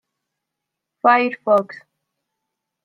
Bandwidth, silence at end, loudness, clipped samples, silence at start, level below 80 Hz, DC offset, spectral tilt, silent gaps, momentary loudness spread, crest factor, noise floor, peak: 6.6 kHz; 1.1 s; -17 LUFS; under 0.1%; 1.05 s; -76 dBFS; under 0.1%; -6.5 dB/octave; none; 6 LU; 20 dB; -82 dBFS; -2 dBFS